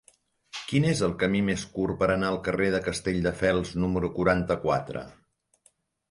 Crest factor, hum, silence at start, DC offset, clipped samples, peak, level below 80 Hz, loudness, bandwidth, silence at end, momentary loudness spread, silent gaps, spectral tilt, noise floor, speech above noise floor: 18 dB; none; 0.55 s; under 0.1%; under 0.1%; -10 dBFS; -48 dBFS; -26 LUFS; 11.5 kHz; 1 s; 7 LU; none; -6 dB/octave; -66 dBFS; 40 dB